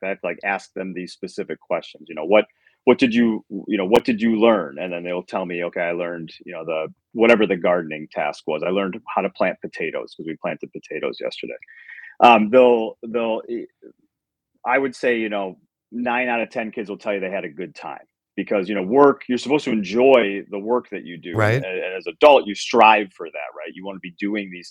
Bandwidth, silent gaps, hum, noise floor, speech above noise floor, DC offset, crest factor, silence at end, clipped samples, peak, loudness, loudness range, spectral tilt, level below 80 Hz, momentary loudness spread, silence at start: 11.5 kHz; none; none; -78 dBFS; 57 dB; under 0.1%; 20 dB; 0 s; under 0.1%; 0 dBFS; -20 LUFS; 7 LU; -6 dB/octave; -64 dBFS; 18 LU; 0 s